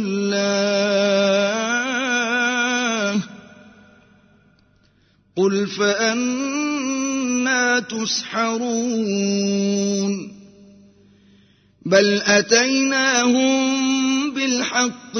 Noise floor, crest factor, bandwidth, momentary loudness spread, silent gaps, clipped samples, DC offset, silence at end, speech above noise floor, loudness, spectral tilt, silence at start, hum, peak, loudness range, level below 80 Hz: -59 dBFS; 20 dB; 6.6 kHz; 6 LU; none; under 0.1%; under 0.1%; 0 s; 40 dB; -19 LUFS; -3 dB/octave; 0 s; none; 0 dBFS; 7 LU; -66 dBFS